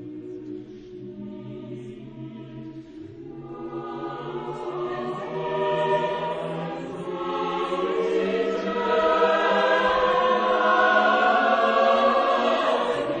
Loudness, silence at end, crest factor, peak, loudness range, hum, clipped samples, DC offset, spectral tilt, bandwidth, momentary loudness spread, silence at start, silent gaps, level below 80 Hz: -23 LUFS; 0 s; 16 dB; -8 dBFS; 17 LU; none; under 0.1%; under 0.1%; -5.5 dB/octave; 9.4 kHz; 20 LU; 0 s; none; -58 dBFS